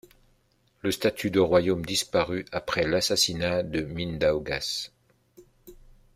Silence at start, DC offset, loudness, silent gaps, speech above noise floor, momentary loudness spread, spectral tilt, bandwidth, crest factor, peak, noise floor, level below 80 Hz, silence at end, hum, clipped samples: 0.85 s; under 0.1%; -26 LUFS; none; 41 dB; 9 LU; -4 dB/octave; 16 kHz; 20 dB; -8 dBFS; -67 dBFS; -52 dBFS; 0.4 s; none; under 0.1%